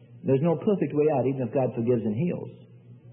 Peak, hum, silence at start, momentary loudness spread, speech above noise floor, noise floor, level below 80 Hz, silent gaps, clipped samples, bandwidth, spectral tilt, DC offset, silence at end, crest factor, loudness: -10 dBFS; none; 0.1 s; 6 LU; 24 dB; -49 dBFS; -68 dBFS; none; under 0.1%; 3.5 kHz; -13 dB/octave; under 0.1%; 0 s; 16 dB; -26 LUFS